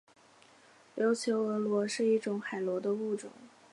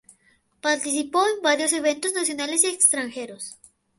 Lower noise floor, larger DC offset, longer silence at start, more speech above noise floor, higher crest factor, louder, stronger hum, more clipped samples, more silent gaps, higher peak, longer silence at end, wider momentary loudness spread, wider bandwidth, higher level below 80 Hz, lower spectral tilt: about the same, -61 dBFS vs -63 dBFS; neither; first, 0.95 s vs 0.65 s; second, 29 dB vs 40 dB; second, 14 dB vs 22 dB; second, -32 LUFS vs -21 LUFS; neither; neither; neither; second, -18 dBFS vs -2 dBFS; second, 0.25 s vs 0.45 s; second, 9 LU vs 16 LU; about the same, 11.5 kHz vs 12 kHz; second, -86 dBFS vs -72 dBFS; first, -5 dB/octave vs 0 dB/octave